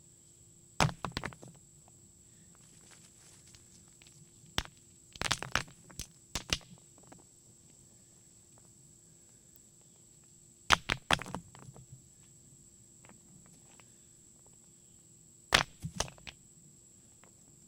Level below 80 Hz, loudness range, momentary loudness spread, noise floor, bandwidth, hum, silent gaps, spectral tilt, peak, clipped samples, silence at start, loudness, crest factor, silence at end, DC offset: -56 dBFS; 21 LU; 26 LU; -60 dBFS; 17.5 kHz; none; none; -2.5 dB/octave; -4 dBFS; under 0.1%; 0.8 s; -34 LUFS; 38 dB; 1.35 s; under 0.1%